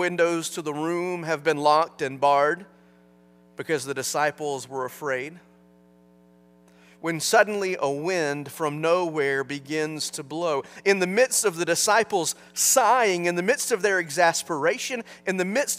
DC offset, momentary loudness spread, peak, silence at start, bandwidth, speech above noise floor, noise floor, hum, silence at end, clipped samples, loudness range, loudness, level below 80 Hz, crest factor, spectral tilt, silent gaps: under 0.1%; 10 LU; -4 dBFS; 0 s; 16 kHz; 32 dB; -56 dBFS; 60 Hz at -55 dBFS; 0 s; under 0.1%; 9 LU; -24 LUFS; -74 dBFS; 20 dB; -3 dB/octave; none